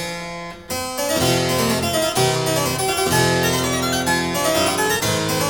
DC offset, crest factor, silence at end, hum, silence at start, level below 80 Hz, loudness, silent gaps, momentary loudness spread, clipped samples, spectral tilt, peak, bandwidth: 0.2%; 16 dB; 0 s; none; 0 s; -44 dBFS; -19 LUFS; none; 9 LU; under 0.1%; -3.5 dB/octave; -4 dBFS; 19 kHz